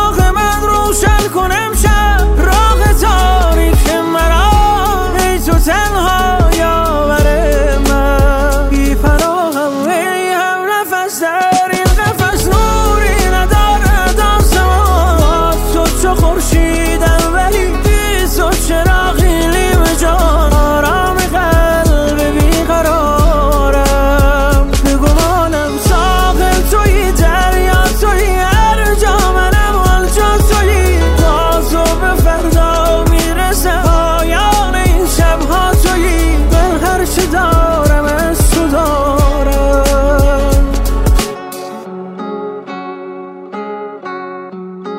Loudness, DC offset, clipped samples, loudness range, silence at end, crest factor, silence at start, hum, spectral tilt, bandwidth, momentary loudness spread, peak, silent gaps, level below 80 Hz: -11 LUFS; under 0.1%; under 0.1%; 2 LU; 0 s; 10 dB; 0 s; none; -5 dB/octave; 16.5 kHz; 4 LU; 0 dBFS; none; -12 dBFS